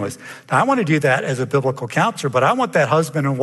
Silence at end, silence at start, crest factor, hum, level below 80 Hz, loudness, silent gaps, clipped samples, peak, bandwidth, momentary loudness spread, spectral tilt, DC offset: 0 s; 0 s; 16 dB; none; -64 dBFS; -18 LUFS; none; under 0.1%; -2 dBFS; 12.5 kHz; 4 LU; -6 dB/octave; under 0.1%